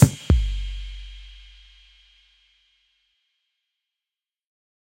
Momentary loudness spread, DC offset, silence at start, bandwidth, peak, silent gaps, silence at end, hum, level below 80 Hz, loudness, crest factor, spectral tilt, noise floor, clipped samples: 26 LU; under 0.1%; 0 s; 16 kHz; 0 dBFS; none; 3.55 s; none; -32 dBFS; -24 LUFS; 26 dB; -6.5 dB/octave; under -90 dBFS; under 0.1%